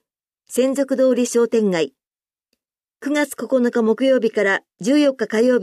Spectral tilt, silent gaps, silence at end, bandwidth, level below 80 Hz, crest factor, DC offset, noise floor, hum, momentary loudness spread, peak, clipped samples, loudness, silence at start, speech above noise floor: -4.5 dB/octave; none; 0 s; 14.5 kHz; -72 dBFS; 12 dB; under 0.1%; under -90 dBFS; none; 6 LU; -6 dBFS; under 0.1%; -19 LUFS; 0.5 s; over 72 dB